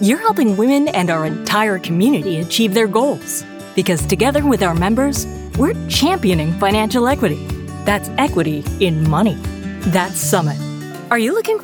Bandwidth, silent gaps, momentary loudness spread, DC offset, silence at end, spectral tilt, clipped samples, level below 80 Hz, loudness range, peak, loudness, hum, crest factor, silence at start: over 20 kHz; none; 8 LU; under 0.1%; 0 s; -5 dB/octave; under 0.1%; -36 dBFS; 2 LU; -2 dBFS; -17 LUFS; none; 16 dB; 0 s